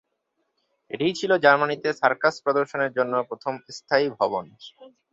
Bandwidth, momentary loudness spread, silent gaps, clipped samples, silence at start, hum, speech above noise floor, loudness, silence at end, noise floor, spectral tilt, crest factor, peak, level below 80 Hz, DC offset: 7.8 kHz; 13 LU; none; under 0.1%; 0.95 s; none; 52 dB; -23 LUFS; 0.25 s; -76 dBFS; -4.5 dB/octave; 20 dB; -4 dBFS; -70 dBFS; under 0.1%